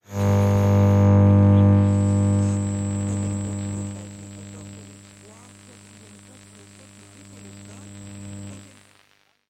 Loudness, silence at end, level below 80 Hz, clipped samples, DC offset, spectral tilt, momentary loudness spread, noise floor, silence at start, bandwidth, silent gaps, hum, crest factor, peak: -19 LUFS; 0.9 s; -52 dBFS; under 0.1%; under 0.1%; -8 dB/octave; 25 LU; -61 dBFS; 0.1 s; 9.6 kHz; none; 50 Hz at -30 dBFS; 14 dB; -8 dBFS